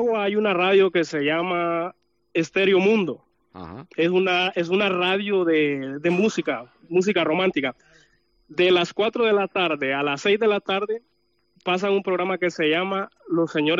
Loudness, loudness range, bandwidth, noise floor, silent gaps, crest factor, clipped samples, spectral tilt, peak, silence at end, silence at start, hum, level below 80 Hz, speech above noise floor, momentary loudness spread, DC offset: -22 LUFS; 2 LU; 7.6 kHz; -66 dBFS; none; 14 dB; under 0.1%; -5.5 dB/octave; -8 dBFS; 0 s; 0 s; none; -68 dBFS; 44 dB; 11 LU; under 0.1%